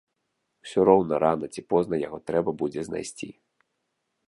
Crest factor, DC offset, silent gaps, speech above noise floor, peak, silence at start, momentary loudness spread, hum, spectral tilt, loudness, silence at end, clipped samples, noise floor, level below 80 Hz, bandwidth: 22 dB; under 0.1%; none; 53 dB; -4 dBFS; 0.65 s; 17 LU; none; -6.5 dB/octave; -25 LUFS; 0.95 s; under 0.1%; -78 dBFS; -60 dBFS; 11.5 kHz